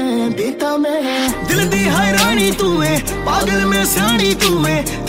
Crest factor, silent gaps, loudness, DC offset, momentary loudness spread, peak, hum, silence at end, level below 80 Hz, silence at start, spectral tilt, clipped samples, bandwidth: 14 dB; none; -15 LUFS; under 0.1%; 5 LU; -2 dBFS; none; 0 s; -32 dBFS; 0 s; -4 dB/octave; under 0.1%; 16.5 kHz